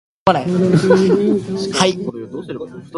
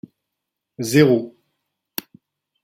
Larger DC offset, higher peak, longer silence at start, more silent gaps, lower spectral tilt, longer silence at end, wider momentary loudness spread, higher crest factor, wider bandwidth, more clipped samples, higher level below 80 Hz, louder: neither; about the same, 0 dBFS vs -2 dBFS; second, 0.25 s vs 0.8 s; neither; about the same, -6 dB/octave vs -6 dB/octave; second, 0 s vs 1.35 s; about the same, 16 LU vs 17 LU; about the same, 16 dB vs 20 dB; second, 11.5 kHz vs 16.5 kHz; neither; first, -52 dBFS vs -64 dBFS; about the same, -16 LUFS vs -18 LUFS